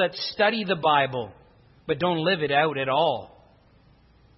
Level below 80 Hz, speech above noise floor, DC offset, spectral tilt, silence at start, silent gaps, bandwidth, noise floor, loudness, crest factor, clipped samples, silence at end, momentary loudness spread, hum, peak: -62 dBFS; 33 dB; under 0.1%; -7.5 dB/octave; 0 s; none; 6 kHz; -57 dBFS; -24 LUFS; 18 dB; under 0.1%; 1.1 s; 12 LU; none; -6 dBFS